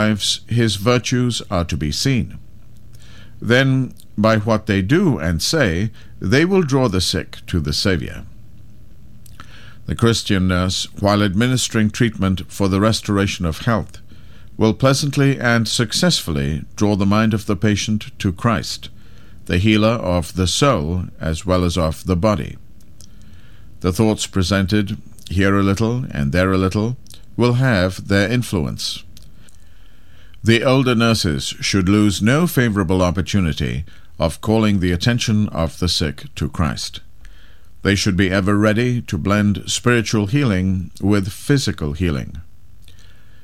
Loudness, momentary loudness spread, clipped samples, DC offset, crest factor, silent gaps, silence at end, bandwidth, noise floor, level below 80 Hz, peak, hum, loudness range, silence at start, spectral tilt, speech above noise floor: -18 LUFS; 9 LU; under 0.1%; 2%; 18 dB; none; 1 s; 16 kHz; -46 dBFS; -38 dBFS; 0 dBFS; none; 4 LU; 0 s; -5 dB/octave; 29 dB